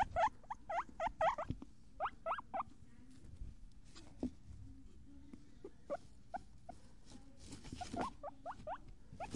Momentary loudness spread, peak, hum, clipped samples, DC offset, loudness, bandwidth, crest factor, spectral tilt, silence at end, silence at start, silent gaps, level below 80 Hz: 23 LU; -24 dBFS; none; under 0.1%; 0.1%; -44 LUFS; 11.5 kHz; 20 dB; -5.5 dB/octave; 0 s; 0 s; none; -60 dBFS